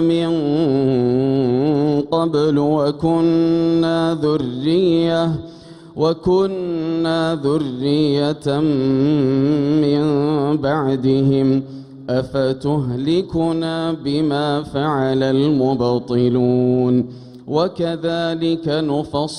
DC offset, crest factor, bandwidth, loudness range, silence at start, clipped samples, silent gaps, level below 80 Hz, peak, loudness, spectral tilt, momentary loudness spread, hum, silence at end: under 0.1%; 12 dB; 10.5 kHz; 2 LU; 0 s; under 0.1%; none; -50 dBFS; -6 dBFS; -18 LUFS; -8 dB/octave; 5 LU; none; 0 s